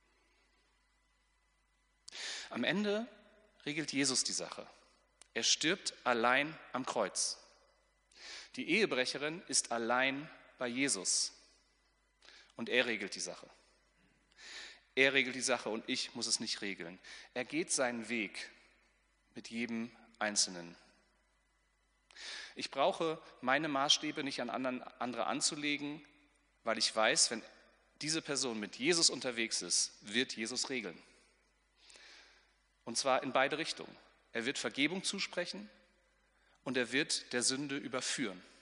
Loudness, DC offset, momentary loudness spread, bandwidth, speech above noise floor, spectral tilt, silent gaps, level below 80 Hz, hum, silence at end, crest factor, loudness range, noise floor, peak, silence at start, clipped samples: -35 LUFS; under 0.1%; 18 LU; 10.5 kHz; 40 dB; -1.5 dB/octave; none; -78 dBFS; none; 0.15 s; 24 dB; 6 LU; -76 dBFS; -14 dBFS; 2.1 s; under 0.1%